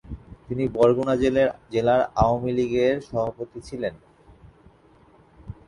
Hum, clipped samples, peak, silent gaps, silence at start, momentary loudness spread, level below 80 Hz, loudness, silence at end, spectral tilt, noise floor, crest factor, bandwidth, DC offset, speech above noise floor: none; under 0.1%; -6 dBFS; none; 0.05 s; 15 LU; -44 dBFS; -23 LUFS; 0.15 s; -7 dB/octave; -55 dBFS; 18 dB; 11 kHz; under 0.1%; 32 dB